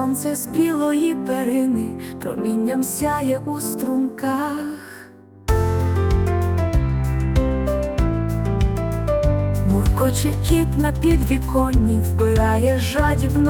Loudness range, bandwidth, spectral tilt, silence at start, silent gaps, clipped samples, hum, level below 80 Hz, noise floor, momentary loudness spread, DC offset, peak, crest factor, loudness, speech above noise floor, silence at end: 4 LU; 19.5 kHz; -6.5 dB/octave; 0 s; none; under 0.1%; none; -26 dBFS; -43 dBFS; 6 LU; under 0.1%; -4 dBFS; 14 dB; -20 LUFS; 24 dB; 0 s